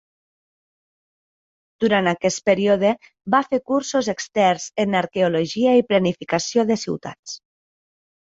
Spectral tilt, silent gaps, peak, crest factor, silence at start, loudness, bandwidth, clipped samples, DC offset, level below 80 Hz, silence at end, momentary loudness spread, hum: -4.5 dB/octave; 7.19-7.23 s; -4 dBFS; 18 dB; 1.8 s; -20 LUFS; 8 kHz; under 0.1%; under 0.1%; -62 dBFS; 0.9 s; 11 LU; none